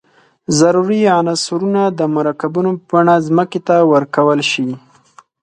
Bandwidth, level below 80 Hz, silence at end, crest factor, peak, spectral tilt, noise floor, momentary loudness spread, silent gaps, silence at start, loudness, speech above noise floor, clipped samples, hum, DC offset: 11 kHz; -60 dBFS; 0.65 s; 14 dB; 0 dBFS; -5 dB/octave; -47 dBFS; 6 LU; none; 0.5 s; -14 LUFS; 34 dB; under 0.1%; none; under 0.1%